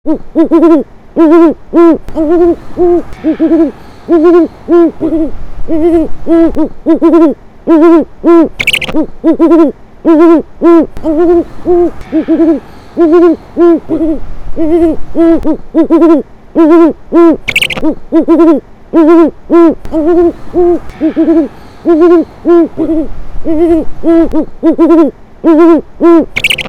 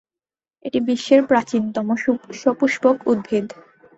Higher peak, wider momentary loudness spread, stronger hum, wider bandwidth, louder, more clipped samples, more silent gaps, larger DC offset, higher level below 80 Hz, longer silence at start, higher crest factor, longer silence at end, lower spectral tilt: about the same, 0 dBFS vs -2 dBFS; about the same, 8 LU vs 8 LU; neither; first, 14 kHz vs 8 kHz; first, -8 LUFS vs -19 LUFS; first, 6% vs under 0.1%; neither; neither; first, -28 dBFS vs -62 dBFS; second, 0.05 s vs 0.65 s; second, 8 dB vs 18 dB; second, 0 s vs 0.5 s; about the same, -6 dB/octave vs -5.5 dB/octave